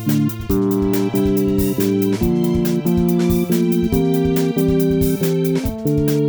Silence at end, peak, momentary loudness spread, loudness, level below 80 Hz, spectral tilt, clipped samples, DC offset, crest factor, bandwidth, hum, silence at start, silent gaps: 0 s; -4 dBFS; 3 LU; -17 LUFS; -34 dBFS; -7 dB/octave; under 0.1%; under 0.1%; 12 dB; over 20 kHz; none; 0 s; none